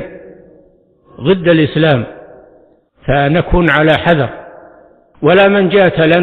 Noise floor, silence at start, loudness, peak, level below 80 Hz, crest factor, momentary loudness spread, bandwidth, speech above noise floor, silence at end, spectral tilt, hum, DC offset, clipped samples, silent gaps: -49 dBFS; 0 s; -11 LUFS; 0 dBFS; -30 dBFS; 12 dB; 12 LU; 4.7 kHz; 39 dB; 0 s; -8.5 dB/octave; none; under 0.1%; under 0.1%; none